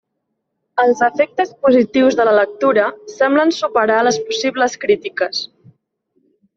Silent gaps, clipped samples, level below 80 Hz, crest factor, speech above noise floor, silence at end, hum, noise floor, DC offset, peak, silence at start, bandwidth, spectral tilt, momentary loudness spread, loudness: none; under 0.1%; -62 dBFS; 14 dB; 58 dB; 1.1 s; none; -73 dBFS; under 0.1%; -2 dBFS; 0.75 s; 7.6 kHz; -3.5 dB/octave; 7 LU; -16 LUFS